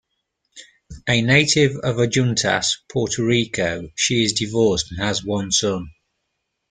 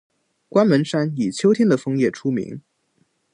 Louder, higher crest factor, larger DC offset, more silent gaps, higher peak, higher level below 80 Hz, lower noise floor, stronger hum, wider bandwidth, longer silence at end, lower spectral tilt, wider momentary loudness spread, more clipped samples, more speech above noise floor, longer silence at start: about the same, -19 LUFS vs -20 LUFS; about the same, 20 dB vs 18 dB; neither; neither; about the same, -2 dBFS vs -4 dBFS; first, -48 dBFS vs -66 dBFS; first, -76 dBFS vs -66 dBFS; neither; about the same, 9.6 kHz vs 10.5 kHz; about the same, 0.8 s vs 0.75 s; second, -3.5 dB/octave vs -6.5 dB/octave; about the same, 8 LU vs 9 LU; neither; first, 56 dB vs 47 dB; about the same, 0.55 s vs 0.55 s